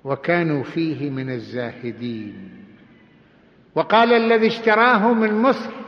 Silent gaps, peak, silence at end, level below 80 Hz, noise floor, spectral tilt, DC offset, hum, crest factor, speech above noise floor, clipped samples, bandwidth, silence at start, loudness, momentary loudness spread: none; -4 dBFS; 0 s; -66 dBFS; -53 dBFS; -7.5 dB/octave; under 0.1%; none; 16 dB; 33 dB; under 0.1%; 6.6 kHz; 0.05 s; -19 LUFS; 15 LU